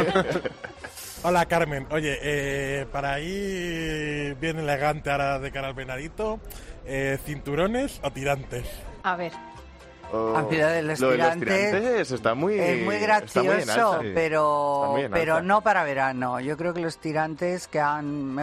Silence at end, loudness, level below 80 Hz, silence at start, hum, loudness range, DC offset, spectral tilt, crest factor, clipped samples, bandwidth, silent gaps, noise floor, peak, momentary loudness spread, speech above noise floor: 0 s; -25 LUFS; -46 dBFS; 0 s; none; 6 LU; under 0.1%; -5 dB/octave; 20 dB; under 0.1%; 14 kHz; none; -45 dBFS; -6 dBFS; 11 LU; 20 dB